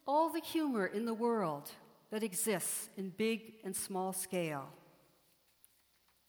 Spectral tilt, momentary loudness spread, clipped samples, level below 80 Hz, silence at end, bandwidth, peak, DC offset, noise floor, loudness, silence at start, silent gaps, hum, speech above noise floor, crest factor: -4 dB/octave; 11 LU; under 0.1%; -82 dBFS; 1.5 s; over 20 kHz; -22 dBFS; under 0.1%; -73 dBFS; -37 LUFS; 0.05 s; none; none; 36 dB; 16 dB